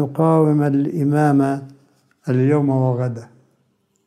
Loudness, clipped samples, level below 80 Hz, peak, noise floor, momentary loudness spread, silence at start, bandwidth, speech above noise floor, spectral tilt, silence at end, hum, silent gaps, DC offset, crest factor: -18 LUFS; under 0.1%; -68 dBFS; -4 dBFS; -65 dBFS; 11 LU; 0 s; 13 kHz; 48 dB; -9.5 dB/octave; 0.8 s; none; none; under 0.1%; 14 dB